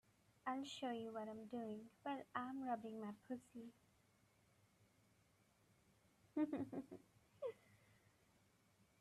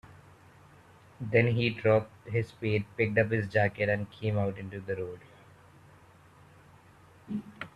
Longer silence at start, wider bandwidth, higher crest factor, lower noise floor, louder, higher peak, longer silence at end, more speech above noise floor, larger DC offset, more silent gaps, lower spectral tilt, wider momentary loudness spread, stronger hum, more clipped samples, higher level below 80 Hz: first, 0.45 s vs 0.1 s; first, 13.5 kHz vs 9.6 kHz; about the same, 22 dB vs 22 dB; first, -77 dBFS vs -57 dBFS; second, -49 LUFS vs -30 LUFS; second, -30 dBFS vs -10 dBFS; first, 1.05 s vs 0.1 s; about the same, 28 dB vs 28 dB; neither; neither; second, -5.5 dB/octave vs -8 dB/octave; about the same, 14 LU vs 13 LU; neither; neither; second, -88 dBFS vs -64 dBFS